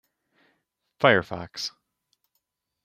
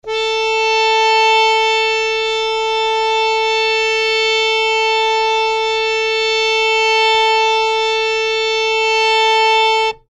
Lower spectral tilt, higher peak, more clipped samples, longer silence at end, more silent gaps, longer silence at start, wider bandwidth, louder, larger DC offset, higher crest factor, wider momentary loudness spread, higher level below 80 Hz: first, -4.5 dB/octave vs 1 dB/octave; about the same, -4 dBFS vs -2 dBFS; neither; first, 1.15 s vs 0.15 s; neither; first, 1 s vs 0.05 s; first, 15 kHz vs 11 kHz; second, -24 LUFS vs -13 LUFS; neither; first, 26 dB vs 12 dB; first, 14 LU vs 4 LU; second, -66 dBFS vs -50 dBFS